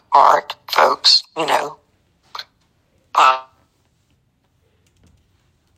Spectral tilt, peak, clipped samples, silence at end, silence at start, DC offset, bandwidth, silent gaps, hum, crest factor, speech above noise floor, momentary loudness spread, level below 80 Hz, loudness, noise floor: -0.5 dB/octave; 0 dBFS; under 0.1%; 2.35 s; 0.1 s; under 0.1%; 15 kHz; none; none; 20 dB; 47 dB; 22 LU; -68 dBFS; -15 LUFS; -63 dBFS